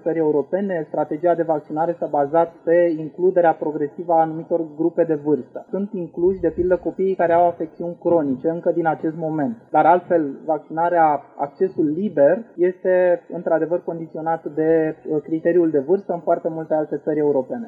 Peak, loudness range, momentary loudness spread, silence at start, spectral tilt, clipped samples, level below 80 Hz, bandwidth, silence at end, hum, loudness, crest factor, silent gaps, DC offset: -4 dBFS; 2 LU; 8 LU; 0.05 s; -10.5 dB/octave; under 0.1%; -56 dBFS; 4 kHz; 0 s; none; -20 LUFS; 16 dB; none; under 0.1%